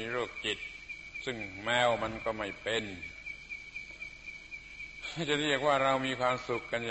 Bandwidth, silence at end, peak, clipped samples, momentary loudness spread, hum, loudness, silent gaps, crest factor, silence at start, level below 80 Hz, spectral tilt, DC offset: 8.2 kHz; 0 s; -14 dBFS; under 0.1%; 15 LU; none; -33 LUFS; none; 20 dB; 0 s; -60 dBFS; -4 dB/octave; under 0.1%